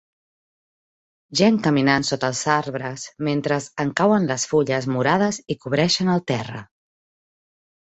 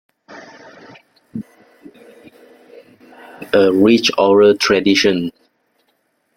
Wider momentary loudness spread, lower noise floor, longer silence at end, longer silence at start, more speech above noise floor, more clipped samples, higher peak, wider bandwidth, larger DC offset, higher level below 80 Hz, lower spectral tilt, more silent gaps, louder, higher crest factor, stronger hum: second, 10 LU vs 21 LU; first, under -90 dBFS vs -65 dBFS; first, 1.25 s vs 1.05 s; first, 1.3 s vs 0.3 s; first, over 69 dB vs 52 dB; neither; about the same, -2 dBFS vs 0 dBFS; second, 8.2 kHz vs 15 kHz; neither; about the same, -58 dBFS vs -58 dBFS; about the same, -4.5 dB/octave vs -4.5 dB/octave; neither; second, -21 LUFS vs -13 LUFS; about the same, 20 dB vs 18 dB; neither